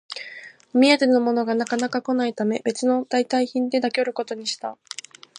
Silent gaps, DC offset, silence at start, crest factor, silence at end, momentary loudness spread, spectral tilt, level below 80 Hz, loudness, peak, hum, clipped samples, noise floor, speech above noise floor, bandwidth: none; under 0.1%; 0.1 s; 20 dB; 0.65 s; 17 LU; -3.5 dB/octave; -76 dBFS; -22 LUFS; -2 dBFS; none; under 0.1%; -42 dBFS; 21 dB; 10.5 kHz